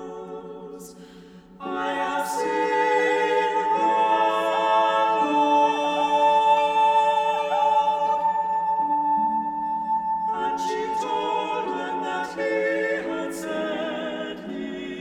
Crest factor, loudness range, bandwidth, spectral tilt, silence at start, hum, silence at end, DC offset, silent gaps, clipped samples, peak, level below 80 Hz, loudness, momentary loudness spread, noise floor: 14 dB; 6 LU; 15 kHz; -4 dB/octave; 0 s; none; 0 s; under 0.1%; none; under 0.1%; -8 dBFS; -62 dBFS; -23 LUFS; 13 LU; -46 dBFS